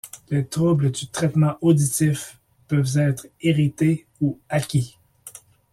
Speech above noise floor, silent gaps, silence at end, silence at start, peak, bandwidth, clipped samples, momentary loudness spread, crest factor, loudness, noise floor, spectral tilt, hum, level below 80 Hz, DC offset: 24 dB; none; 0.4 s; 0.05 s; -6 dBFS; 14.5 kHz; under 0.1%; 11 LU; 16 dB; -22 LUFS; -45 dBFS; -6 dB/octave; none; -56 dBFS; under 0.1%